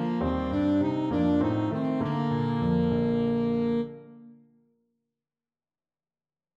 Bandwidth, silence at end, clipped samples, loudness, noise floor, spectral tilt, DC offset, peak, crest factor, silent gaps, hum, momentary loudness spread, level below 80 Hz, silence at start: 7.2 kHz; 2.25 s; under 0.1%; -27 LUFS; under -90 dBFS; -9.5 dB/octave; under 0.1%; -12 dBFS; 16 dB; none; none; 3 LU; -48 dBFS; 0 s